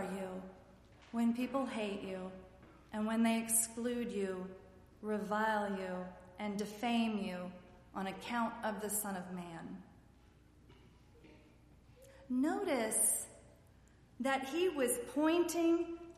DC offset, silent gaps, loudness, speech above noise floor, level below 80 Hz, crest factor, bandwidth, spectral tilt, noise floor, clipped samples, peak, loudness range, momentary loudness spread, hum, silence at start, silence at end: under 0.1%; none; -37 LUFS; 27 dB; -68 dBFS; 20 dB; 15 kHz; -3.5 dB/octave; -64 dBFS; under 0.1%; -18 dBFS; 8 LU; 17 LU; none; 0 s; 0.05 s